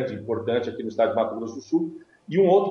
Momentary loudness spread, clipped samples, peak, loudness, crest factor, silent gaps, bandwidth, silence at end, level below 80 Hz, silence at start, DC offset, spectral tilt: 13 LU; under 0.1%; -8 dBFS; -25 LUFS; 16 dB; none; 6.8 kHz; 0 s; -70 dBFS; 0 s; under 0.1%; -7.5 dB/octave